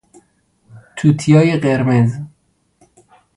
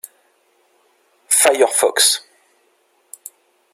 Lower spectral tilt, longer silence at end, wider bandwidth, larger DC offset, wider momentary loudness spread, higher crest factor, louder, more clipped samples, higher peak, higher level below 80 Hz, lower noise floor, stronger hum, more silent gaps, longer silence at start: first, -7.5 dB/octave vs 1.5 dB/octave; second, 1.1 s vs 1.55 s; second, 11 kHz vs 16.5 kHz; neither; second, 20 LU vs 24 LU; about the same, 16 dB vs 20 dB; about the same, -14 LUFS vs -14 LUFS; neither; about the same, 0 dBFS vs 0 dBFS; first, -52 dBFS vs -74 dBFS; about the same, -60 dBFS vs -61 dBFS; neither; neither; second, 0.75 s vs 1.3 s